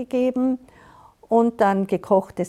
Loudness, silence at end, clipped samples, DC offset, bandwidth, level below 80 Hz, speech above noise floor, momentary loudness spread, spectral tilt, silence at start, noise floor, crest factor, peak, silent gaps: -21 LUFS; 0 s; under 0.1%; under 0.1%; 12.5 kHz; -60 dBFS; 29 dB; 5 LU; -7.5 dB/octave; 0 s; -50 dBFS; 16 dB; -6 dBFS; none